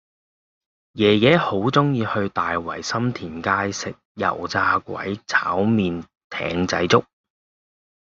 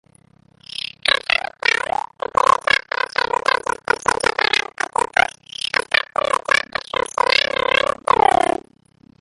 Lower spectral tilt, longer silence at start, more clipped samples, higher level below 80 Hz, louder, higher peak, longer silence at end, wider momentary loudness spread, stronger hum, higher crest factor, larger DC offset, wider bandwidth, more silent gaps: first, -4 dB/octave vs -1.5 dB/octave; about the same, 0.95 s vs 1.05 s; neither; second, -56 dBFS vs -50 dBFS; second, -21 LUFS vs -18 LUFS; about the same, -2 dBFS vs 0 dBFS; second, 1.1 s vs 1.85 s; first, 12 LU vs 8 LU; neither; about the same, 20 dB vs 20 dB; neither; second, 7.8 kHz vs 11.5 kHz; first, 4.05-4.15 s, 6.24-6.30 s vs none